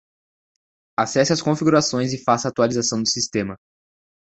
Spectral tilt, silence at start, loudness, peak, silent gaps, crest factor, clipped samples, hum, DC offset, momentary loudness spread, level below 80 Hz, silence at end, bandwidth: -4 dB/octave; 1 s; -20 LUFS; -2 dBFS; none; 20 dB; under 0.1%; none; under 0.1%; 7 LU; -56 dBFS; 0.65 s; 8.2 kHz